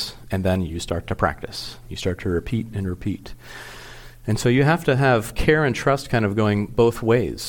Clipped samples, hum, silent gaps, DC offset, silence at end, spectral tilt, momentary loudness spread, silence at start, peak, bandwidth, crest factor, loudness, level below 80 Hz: under 0.1%; none; none; under 0.1%; 0 s; -6 dB/octave; 16 LU; 0 s; -4 dBFS; 17.5 kHz; 18 dB; -22 LUFS; -38 dBFS